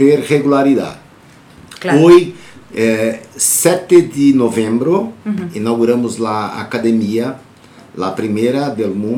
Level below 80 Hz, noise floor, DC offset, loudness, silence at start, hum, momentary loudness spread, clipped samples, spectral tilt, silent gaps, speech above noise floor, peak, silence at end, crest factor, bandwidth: -54 dBFS; -42 dBFS; under 0.1%; -14 LUFS; 0 s; none; 12 LU; under 0.1%; -5 dB/octave; none; 29 dB; 0 dBFS; 0 s; 14 dB; 18.5 kHz